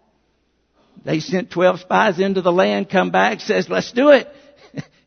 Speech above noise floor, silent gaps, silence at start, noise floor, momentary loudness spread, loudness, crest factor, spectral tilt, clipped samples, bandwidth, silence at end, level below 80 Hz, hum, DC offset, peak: 48 dB; none; 1.05 s; -65 dBFS; 21 LU; -17 LUFS; 18 dB; -5.5 dB/octave; under 0.1%; 6.6 kHz; 0.25 s; -62 dBFS; none; under 0.1%; 0 dBFS